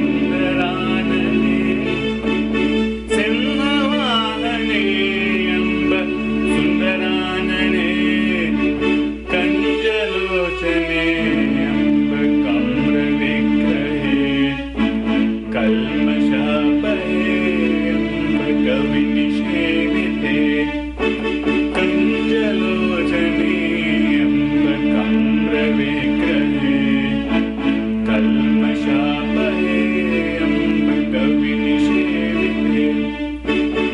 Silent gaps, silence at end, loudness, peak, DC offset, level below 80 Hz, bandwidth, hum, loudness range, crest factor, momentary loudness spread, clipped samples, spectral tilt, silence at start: none; 0 s; -17 LUFS; -6 dBFS; under 0.1%; -36 dBFS; 10.5 kHz; none; 1 LU; 10 dB; 3 LU; under 0.1%; -6.5 dB/octave; 0 s